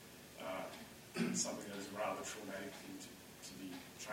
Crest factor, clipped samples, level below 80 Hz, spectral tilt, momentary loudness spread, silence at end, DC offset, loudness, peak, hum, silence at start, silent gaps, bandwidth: 20 dB; under 0.1%; -76 dBFS; -3 dB/octave; 13 LU; 0 s; under 0.1%; -45 LUFS; -26 dBFS; none; 0 s; none; 16.5 kHz